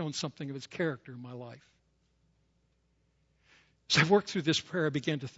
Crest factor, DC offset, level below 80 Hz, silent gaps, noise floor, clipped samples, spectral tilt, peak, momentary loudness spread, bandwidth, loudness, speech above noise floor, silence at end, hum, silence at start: 22 dB; under 0.1%; -70 dBFS; none; -73 dBFS; under 0.1%; -4.5 dB/octave; -12 dBFS; 20 LU; 8 kHz; -30 LUFS; 41 dB; 0.1 s; none; 0 s